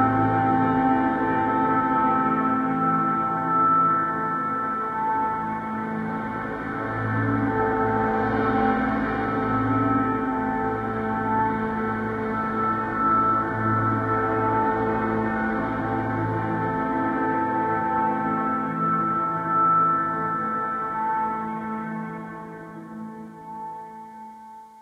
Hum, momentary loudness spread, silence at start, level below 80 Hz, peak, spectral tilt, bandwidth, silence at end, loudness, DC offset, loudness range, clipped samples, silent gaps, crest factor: none; 12 LU; 0 s; -50 dBFS; -8 dBFS; -9 dB/octave; 6.8 kHz; 0 s; -23 LUFS; under 0.1%; 5 LU; under 0.1%; none; 16 dB